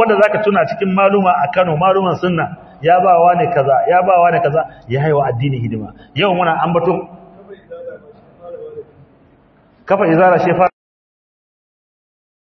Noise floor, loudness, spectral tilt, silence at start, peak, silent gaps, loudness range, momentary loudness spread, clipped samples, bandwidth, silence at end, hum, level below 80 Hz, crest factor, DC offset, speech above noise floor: -50 dBFS; -14 LUFS; -8.5 dB/octave; 0 s; 0 dBFS; none; 7 LU; 21 LU; under 0.1%; 6.2 kHz; 1.9 s; none; -52 dBFS; 16 dB; under 0.1%; 37 dB